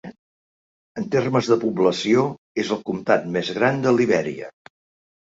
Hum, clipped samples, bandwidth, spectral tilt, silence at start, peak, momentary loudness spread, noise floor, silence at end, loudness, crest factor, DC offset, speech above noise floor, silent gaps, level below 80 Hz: none; under 0.1%; 7.8 kHz; -6 dB/octave; 0.05 s; -4 dBFS; 13 LU; under -90 dBFS; 0.8 s; -21 LUFS; 20 dB; under 0.1%; over 70 dB; 0.19-0.95 s, 2.38-2.55 s; -62 dBFS